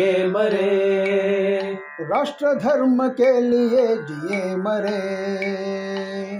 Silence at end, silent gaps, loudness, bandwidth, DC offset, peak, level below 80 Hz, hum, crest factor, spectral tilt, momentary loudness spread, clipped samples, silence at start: 0 s; none; -21 LUFS; 11 kHz; under 0.1%; -8 dBFS; -70 dBFS; none; 12 dB; -6.5 dB/octave; 9 LU; under 0.1%; 0 s